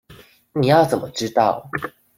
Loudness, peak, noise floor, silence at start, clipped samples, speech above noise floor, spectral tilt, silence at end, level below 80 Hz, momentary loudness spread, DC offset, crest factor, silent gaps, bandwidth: -20 LUFS; -2 dBFS; -48 dBFS; 0.1 s; under 0.1%; 29 dB; -5.5 dB/octave; 0.3 s; -56 dBFS; 13 LU; under 0.1%; 18 dB; none; 16.5 kHz